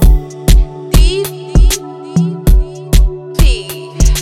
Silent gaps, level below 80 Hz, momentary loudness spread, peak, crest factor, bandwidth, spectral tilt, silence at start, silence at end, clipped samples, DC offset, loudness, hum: none; -10 dBFS; 6 LU; 0 dBFS; 10 dB; 15.5 kHz; -5 dB/octave; 0 s; 0 s; under 0.1%; under 0.1%; -14 LUFS; none